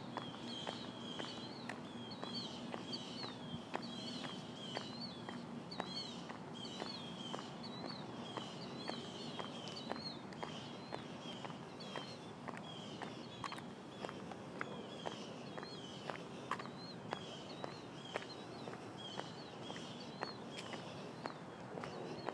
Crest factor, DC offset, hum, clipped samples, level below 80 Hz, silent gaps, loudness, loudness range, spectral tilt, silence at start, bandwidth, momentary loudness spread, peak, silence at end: 26 dB; under 0.1%; none; under 0.1%; -78 dBFS; none; -47 LUFS; 2 LU; -4.5 dB/octave; 0 s; 11 kHz; 4 LU; -22 dBFS; 0 s